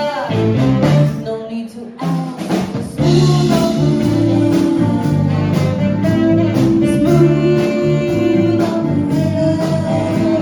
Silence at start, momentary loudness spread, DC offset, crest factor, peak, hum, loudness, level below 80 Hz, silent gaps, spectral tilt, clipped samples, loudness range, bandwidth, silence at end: 0 s; 8 LU; under 0.1%; 12 dB; 0 dBFS; none; -15 LUFS; -40 dBFS; none; -7.5 dB/octave; under 0.1%; 2 LU; 19 kHz; 0 s